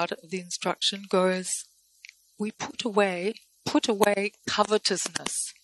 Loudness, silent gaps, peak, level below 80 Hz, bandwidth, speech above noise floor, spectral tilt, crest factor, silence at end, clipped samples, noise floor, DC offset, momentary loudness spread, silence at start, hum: -27 LUFS; none; -2 dBFS; -70 dBFS; 12.5 kHz; 26 dB; -3 dB/octave; 26 dB; 0.1 s; under 0.1%; -53 dBFS; under 0.1%; 10 LU; 0 s; none